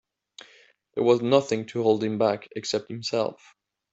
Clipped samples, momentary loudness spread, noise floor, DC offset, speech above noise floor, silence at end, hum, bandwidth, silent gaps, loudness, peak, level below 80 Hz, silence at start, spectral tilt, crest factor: under 0.1%; 9 LU; -58 dBFS; under 0.1%; 33 dB; 0.6 s; none; 8 kHz; none; -25 LUFS; -4 dBFS; -70 dBFS; 0.95 s; -5.5 dB/octave; 22 dB